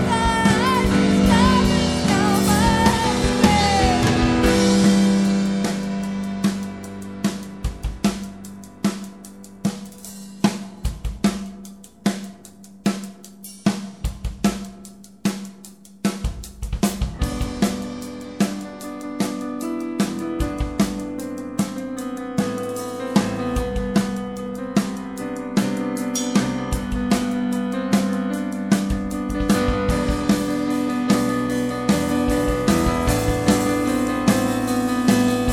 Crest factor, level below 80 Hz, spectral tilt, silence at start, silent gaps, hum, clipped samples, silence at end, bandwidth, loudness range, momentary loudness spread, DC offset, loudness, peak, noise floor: 20 dB; -32 dBFS; -5 dB/octave; 0 s; none; none; under 0.1%; 0 s; 16.5 kHz; 10 LU; 15 LU; 0.2%; -21 LUFS; -2 dBFS; -44 dBFS